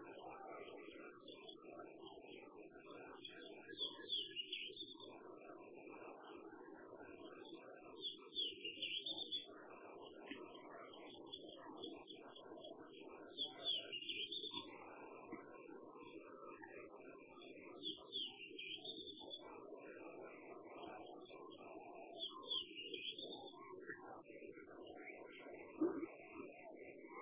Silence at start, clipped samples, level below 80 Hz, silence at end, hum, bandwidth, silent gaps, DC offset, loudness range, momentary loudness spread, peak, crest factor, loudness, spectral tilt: 0 s; under 0.1%; -86 dBFS; 0 s; none; 4 kHz; none; under 0.1%; 8 LU; 14 LU; -30 dBFS; 22 dB; -50 LUFS; 0 dB/octave